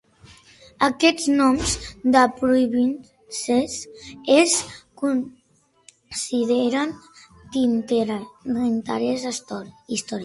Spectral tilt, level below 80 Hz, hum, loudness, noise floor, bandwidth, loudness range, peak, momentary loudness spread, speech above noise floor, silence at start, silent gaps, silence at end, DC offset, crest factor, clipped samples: -3 dB/octave; -48 dBFS; none; -21 LUFS; -62 dBFS; 11.5 kHz; 5 LU; -2 dBFS; 15 LU; 41 dB; 0.8 s; none; 0 s; under 0.1%; 22 dB; under 0.1%